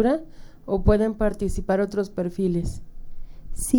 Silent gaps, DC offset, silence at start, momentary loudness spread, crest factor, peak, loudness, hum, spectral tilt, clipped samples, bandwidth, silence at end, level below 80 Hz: none; under 0.1%; 0 s; 15 LU; 20 dB; -4 dBFS; -25 LUFS; none; -7 dB/octave; under 0.1%; 18 kHz; 0 s; -32 dBFS